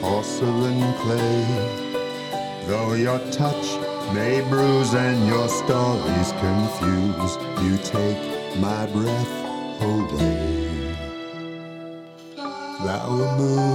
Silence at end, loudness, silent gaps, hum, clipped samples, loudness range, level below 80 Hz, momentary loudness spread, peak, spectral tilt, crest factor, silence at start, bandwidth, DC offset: 0 s; -23 LUFS; none; none; under 0.1%; 6 LU; -42 dBFS; 12 LU; -6 dBFS; -6 dB/octave; 16 dB; 0 s; 17.5 kHz; under 0.1%